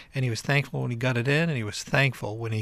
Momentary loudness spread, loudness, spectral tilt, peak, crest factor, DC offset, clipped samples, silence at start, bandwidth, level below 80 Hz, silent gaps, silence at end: 7 LU; -26 LUFS; -5.5 dB/octave; -8 dBFS; 18 dB; under 0.1%; under 0.1%; 0 s; 14 kHz; -56 dBFS; none; 0 s